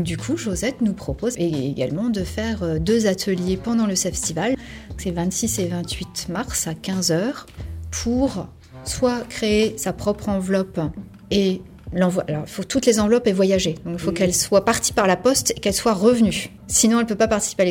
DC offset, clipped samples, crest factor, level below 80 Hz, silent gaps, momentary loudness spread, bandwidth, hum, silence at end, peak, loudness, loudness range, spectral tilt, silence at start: under 0.1%; under 0.1%; 18 dB; -42 dBFS; none; 10 LU; 17.5 kHz; none; 0 s; -4 dBFS; -21 LUFS; 6 LU; -4.5 dB/octave; 0 s